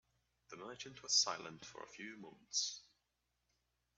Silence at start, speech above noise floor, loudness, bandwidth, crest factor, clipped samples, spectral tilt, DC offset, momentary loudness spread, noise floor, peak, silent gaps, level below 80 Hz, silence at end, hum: 0.5 s; 43 dB; -38 LUFS; 10 kHz; 26 dB; under 0.1%; 0 dB/octave; under 0.1%; 21 LU; -86 dBFS; -20 dBFS; none; -82 dBFS; 1.15 s; none